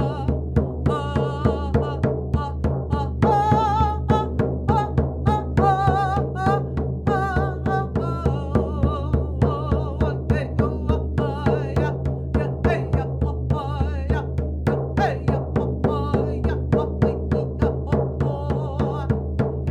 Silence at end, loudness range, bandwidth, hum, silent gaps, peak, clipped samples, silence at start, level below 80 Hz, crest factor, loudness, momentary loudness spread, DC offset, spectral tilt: 0 s; 3 LU; 8 kHz; none; none; -4 dBFS; under 0.1%; 0 s; -30 dBFS; 18 dB; -23 LUFS; 5 LU; under 0.1%; -9 dB/octave